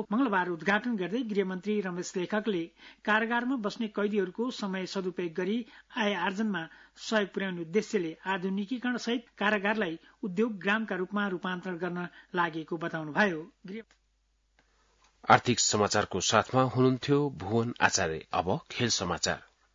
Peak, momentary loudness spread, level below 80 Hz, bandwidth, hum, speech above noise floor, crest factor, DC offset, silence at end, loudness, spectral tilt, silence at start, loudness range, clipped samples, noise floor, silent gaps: -6 dBFS; 10 LU; -68 dBFS; 7.8 kHz; none; 42 dB; 24 dB; under 0.1%; 0.3 s; -30 LUFS; -4 dB/octave; 0 s; 5 LU; under 0.1%; -72 dBFS; none